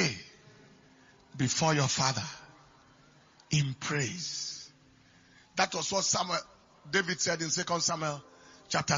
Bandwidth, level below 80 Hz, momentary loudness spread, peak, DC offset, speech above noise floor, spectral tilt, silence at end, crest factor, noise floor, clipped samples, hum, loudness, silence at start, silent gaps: 7.6 kHz; -66 dBFS; 16 LU; -10 dBFS; under 0.1%; 30 dB; -3 dB/octave; 0 s; 24 dB; -61 dBFS; under 0.1%; none; -30 LUFS; 0 s; none